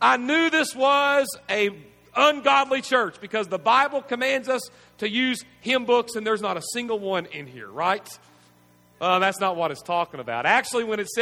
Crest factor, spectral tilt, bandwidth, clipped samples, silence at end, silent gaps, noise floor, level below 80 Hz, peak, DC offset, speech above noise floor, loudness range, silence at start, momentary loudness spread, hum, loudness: 20 dB; -3 dB/octave; 17 kHz; under 0.1%; 0 s; none; -57 dBFS; -70 dBFS; -4 dBFS; under 0.1%; 34 dB; 5 LU; 0 s; 9 LU; 60 Hz at -65 dBFS; -23 LUFS